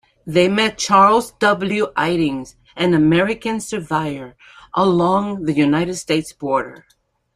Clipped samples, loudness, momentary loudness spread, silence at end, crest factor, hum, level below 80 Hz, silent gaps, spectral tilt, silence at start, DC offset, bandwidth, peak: under 0.1%; -17 LUFS; 11 LU; 0.6 s; 16 dB; none; -52 dBFS; none; -5 dB/octave; 0.25 s; under 0.1%; 15 kHz; -2 dBFS